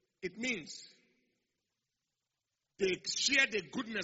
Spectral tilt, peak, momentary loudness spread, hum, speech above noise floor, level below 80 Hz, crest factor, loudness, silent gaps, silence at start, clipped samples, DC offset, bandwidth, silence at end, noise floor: -1 dB/octave; -14 dBFS; 17 LU; none; 53 dB; -74 dBFS; 24 dB; -33 LUFS; none; 0.2 s; under 0.1%; under 0.1%; 8 kHz; 0 s; -89 dBFS